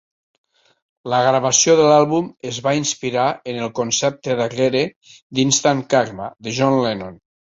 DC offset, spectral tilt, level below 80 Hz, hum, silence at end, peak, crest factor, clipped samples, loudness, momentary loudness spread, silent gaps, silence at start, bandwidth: under 0.1%; -3.5 dB/octave; -58 dBFS; none; 0.45 s; -2 dBFS; 18 dB; under 0.1%; -18 LUFS; 13 LU; 4.96-5.01 s, 5.22-5.30 s; 1.05 s; 8 kHz